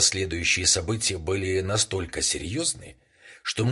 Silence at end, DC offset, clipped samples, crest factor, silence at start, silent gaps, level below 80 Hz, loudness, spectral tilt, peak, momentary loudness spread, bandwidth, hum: 0 s; under 0.1%; under 0.1%; 20 dB; 0 s; none; -42 dBFS; -24 LUFS; -2.5 dB/octave; -6 dBFS; 7 LU; 11.5 kHz; none